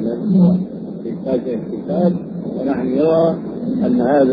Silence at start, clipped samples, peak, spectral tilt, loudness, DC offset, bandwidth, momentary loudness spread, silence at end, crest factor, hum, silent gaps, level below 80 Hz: 0 s; under 0.1%; -2 dBFS; -12 dB/octave; -18 LUFS; under 0.1%; 5 kHz; 12 LU; 0 s; 14 dB; none; none; -52 dBFS